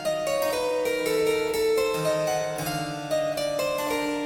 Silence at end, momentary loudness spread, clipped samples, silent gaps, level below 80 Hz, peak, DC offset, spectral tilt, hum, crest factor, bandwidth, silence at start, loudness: 0 s; 4 LU; under 0.1%; none; -56 dBFS; -12 dBFS; under 0.1%; -3.5 dB/octave; none; 14 dB; 17 kHz; 0 s; -26 LUFS